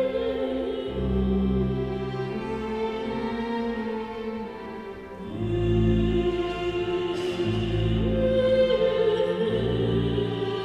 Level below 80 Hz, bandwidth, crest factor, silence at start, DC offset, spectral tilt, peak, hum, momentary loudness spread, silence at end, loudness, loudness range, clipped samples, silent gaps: -38 dBFS; 9.8 kHz; 14 dB; 0 s; under 0.1%; -8 dB/octave; -10 dBFS; none; 10 LU; 0 s; -26 LUFS; 6 LU; under 0.1%; none